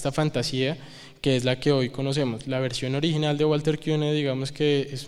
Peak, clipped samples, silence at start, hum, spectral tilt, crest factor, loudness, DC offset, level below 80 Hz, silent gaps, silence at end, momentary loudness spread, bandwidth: -6 dBFS; under 0.1%; 0 s; none; -6 dB/octave; 18 dB; -25 LUFS; under 0.1%; -52 dBFS; none; 0 s; 5 LU; 12.5 kHz